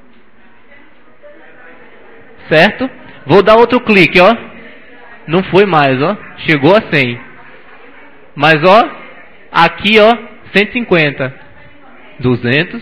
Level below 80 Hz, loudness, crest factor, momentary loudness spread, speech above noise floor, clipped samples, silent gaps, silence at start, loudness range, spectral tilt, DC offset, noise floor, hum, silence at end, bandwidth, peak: -44 dBFS; -10 LUFS; 12 dB; 12 LU; 37 dB; 0.8%; none; 2.45 s; 3 LU; -7 dB/octave; 1%; -46 dBFS; none; 0 s; 5.4 kHz; 0 dBFS